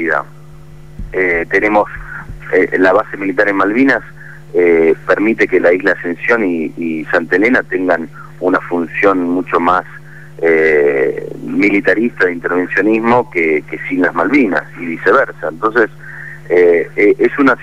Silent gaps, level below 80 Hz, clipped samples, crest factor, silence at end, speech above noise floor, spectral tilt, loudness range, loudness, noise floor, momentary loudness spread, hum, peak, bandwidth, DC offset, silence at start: none; -42 dBFS; under 0.1%; 12 dB; 0 s; 23 dB; -7 dB/octave; 2 LU; -13 LUFS; -36 dBFS; 9 LU; none; -2 dBFS; 10 kHz; 1%; 0 s